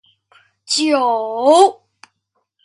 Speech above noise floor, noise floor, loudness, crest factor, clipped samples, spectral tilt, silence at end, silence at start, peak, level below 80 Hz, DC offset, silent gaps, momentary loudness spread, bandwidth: 57 dB; -70 dBFS; -15 LUFS; 18 dB; under 0.1%; -1.5 dB/octave; 0.9 s; 0.7 s; 0 dBFS; -72 dBFS; under 0.1%; none; 7 LU; 11.5 kHz